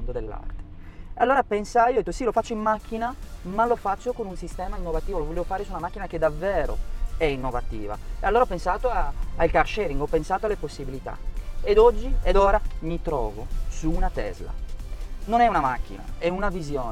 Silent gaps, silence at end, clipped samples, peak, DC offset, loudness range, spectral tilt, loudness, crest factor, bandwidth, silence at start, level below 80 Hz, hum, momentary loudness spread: none; 0 s; under 0.1%; -6 dBFS; under 0.1%; 5 LU; -6 dB/octave; -25 LUFS; 18 dB; 12 kHz; 0 s; -30 dBFS; none; 17 LU